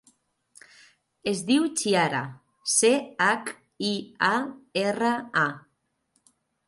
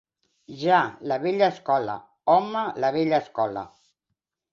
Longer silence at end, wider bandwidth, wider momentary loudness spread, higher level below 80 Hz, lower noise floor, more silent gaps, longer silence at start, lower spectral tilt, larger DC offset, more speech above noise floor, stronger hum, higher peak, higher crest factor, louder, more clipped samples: first, 1.1 s vs 0.85 s; first, 12 kHz vs 7.2 kHz; about the same, 11 LU vs 10 LU; about the same, -72 dBFS vs -68 dBFS; second, -72 dBFS vs -81 dBFS; neither; first, 1.25 s vs 0.5 s; second, -3 dB/octave vs -6.5 dB/octave; neither; second, 47 dB vs 58 dB; neither; about the same, -8 dBFS vs -6 dBFS; about the same, 20 dB vs 18 dB; about the same, -25 LUFS vs -24 LUFS; neither